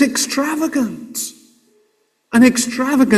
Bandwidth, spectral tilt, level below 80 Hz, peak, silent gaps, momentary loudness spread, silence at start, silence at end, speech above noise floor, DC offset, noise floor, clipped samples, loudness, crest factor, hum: 16 kHz; -3.5 dB/octave; -56 dBFS; 0 dBFS; none; 13 LU; 0 s; 0 s; 47 dB; under 0.1%; -63 dBFS; under 0.1%; -17 LUFS; 16 dB; none